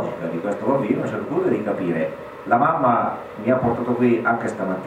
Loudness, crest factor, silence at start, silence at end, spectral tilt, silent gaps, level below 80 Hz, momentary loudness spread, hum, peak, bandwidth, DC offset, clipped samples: -21 LUFS; 18 dB; 0 s; 0 s; -8 dB/octave; none; -56 dBFS; 8 LU; none; -2 dBFS; 9.8 kHz; under 0.1%; under 0.1%